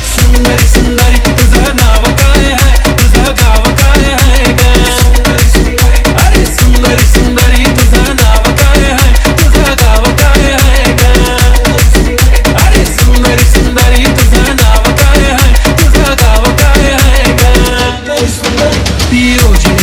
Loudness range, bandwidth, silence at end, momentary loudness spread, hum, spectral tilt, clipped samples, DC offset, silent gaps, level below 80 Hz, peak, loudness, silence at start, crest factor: 1 LU; 18 kHz; 0 s; 1 LU; none; -4.5 dB/octave; 10%; under 0.1%; none; -8 dBFS; 0 dBFS; -7 LUFS; 0 s; 6 dB